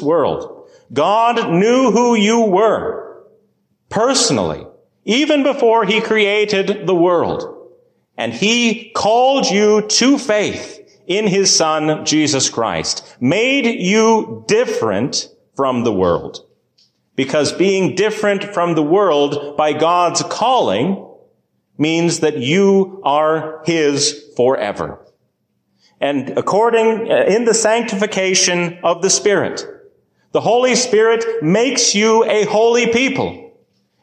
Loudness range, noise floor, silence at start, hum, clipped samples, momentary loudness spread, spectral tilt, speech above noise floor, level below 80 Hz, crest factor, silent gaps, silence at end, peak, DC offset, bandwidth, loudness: 3 LU; -66 dBFS; 0 s; none; under 0.1%; 9 LU; -3.5 dB/octave; 52 dB; -52 dBFS; 12 dB; none; 0.55 s; -2 dBFS; under 0.1%; 10 kHz; -15 LUFS